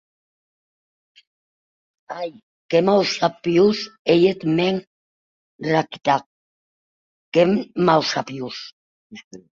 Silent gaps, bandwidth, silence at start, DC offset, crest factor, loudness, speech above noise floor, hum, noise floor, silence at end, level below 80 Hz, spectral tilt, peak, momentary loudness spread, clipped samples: 2.43-2.69 s, 3.99-4.05 s, 4.87-5.59 s, 6.26-7.32 s, 8.72-9.10 s, 9.24-9.31 s; 7.6 kHz; 2.1 s; under 0.1%; 20 dB; -20 LUFS; over 70 dB; none; under -90 dBFS; 0.15 s; -64 dBFS; -5.5 dB/octave; -2 dBFS; 15 LU; under 0.1%